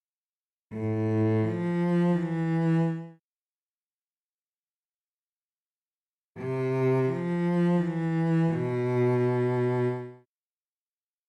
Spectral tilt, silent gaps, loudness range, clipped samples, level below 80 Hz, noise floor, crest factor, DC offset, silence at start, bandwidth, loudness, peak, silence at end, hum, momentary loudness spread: -9.5 dB/octave; 3.19-6.35 s; 9 LU; under 0.1%; -70 dBFS; under -90 dBFS; 12 dB; under 0.1%; 0.7 s; 8 kHz; -27 LUFS; -16 dBFS; 1.1 s; none; 9 LU